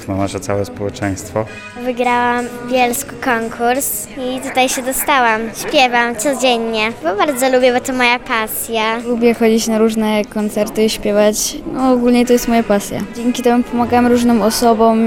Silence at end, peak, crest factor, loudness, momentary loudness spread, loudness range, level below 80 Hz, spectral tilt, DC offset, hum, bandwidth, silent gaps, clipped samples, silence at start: 0 s; 0 dBFS; 14 dB; -15 LUFS; 8 LU; 3 LU; -42 dBFS; -3.5 dB/octave; under 0.1%; none; 17 kHz; none; under 0.1%; 0 s